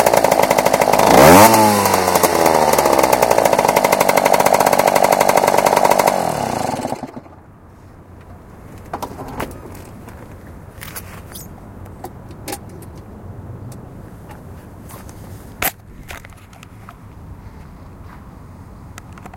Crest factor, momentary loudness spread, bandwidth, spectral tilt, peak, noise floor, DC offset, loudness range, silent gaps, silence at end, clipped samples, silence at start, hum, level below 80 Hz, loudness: 16 dB; 24 LU; over 20 kHz; -3.5 dB/octave; 0 dBFS; -42 dBFS; under 0.1%; 23 LU; none; 0 s; 0.1%; 0 s; none; -42 dBFS; -13 LUFS